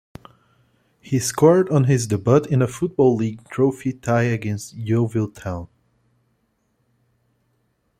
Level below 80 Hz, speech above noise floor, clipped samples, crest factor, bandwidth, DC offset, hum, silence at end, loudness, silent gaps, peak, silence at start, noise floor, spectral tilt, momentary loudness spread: -56 dBFS; 49 dB; under 0.1%; 18 dB; 14.5 kHz; under 0.1%; none; 2.35 s; -20 LUFS; none; -2 dBFS; 1.05 s; -68 dBFS; -6.5 dB/octave; 12 LU